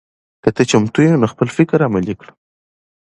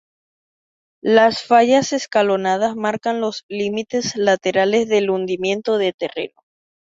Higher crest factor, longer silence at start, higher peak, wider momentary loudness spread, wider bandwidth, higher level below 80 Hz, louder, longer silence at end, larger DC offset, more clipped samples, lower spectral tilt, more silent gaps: about the same, 16 dB vs 16 dB; second, 0.45 s vs 1.05 s; about the same, 0 dBFS vs -2 dBFS; second, 7 LU vs 10 LU; first, 11 kHz vs 7.8 kHz; first, -48 dBFS vs -62 dBFS; first, -15 LUFS vs -18 LUFS; first, 0.9 s vs 0.65 s; neither; neither; first, -6.5 dB/octave vs -4 dB/octave; second, none vs 3.43-3.49 s, 5.94-5.99 s